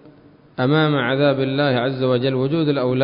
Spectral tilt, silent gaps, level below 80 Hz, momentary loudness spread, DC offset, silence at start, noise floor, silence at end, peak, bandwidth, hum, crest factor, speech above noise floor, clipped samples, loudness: -12 dB/octave; none; -58 dBFS; 3 LU; under 0.1%; 0.6 s; -48 dBFS; 0 s; -6 dBFS; 5.4 kHz; none; 14 dB; 30 dB; under 0.1%; -19 LUFS